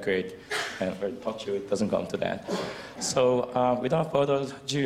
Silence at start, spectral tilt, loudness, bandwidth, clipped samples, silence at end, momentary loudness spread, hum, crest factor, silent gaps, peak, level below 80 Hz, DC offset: 0 s; -4.5 dB/octave; -28 LUFS; 15 kHz; under 0.1%; 0 s; 8 LU; none; 18 dB; none; -10 dBFS; -60 dBFS; under 0.1%